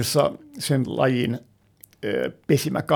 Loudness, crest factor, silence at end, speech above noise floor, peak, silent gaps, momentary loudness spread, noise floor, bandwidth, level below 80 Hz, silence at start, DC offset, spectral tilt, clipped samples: -24 LUFS; 18 dB; 0 s; 31 dB; -6 dBFS; none; 9 LU; -54 dBFS; over 20 kHz; -58 dBFS; 0 s; under 0.1%; -5.5 dB/octave; under 0.1%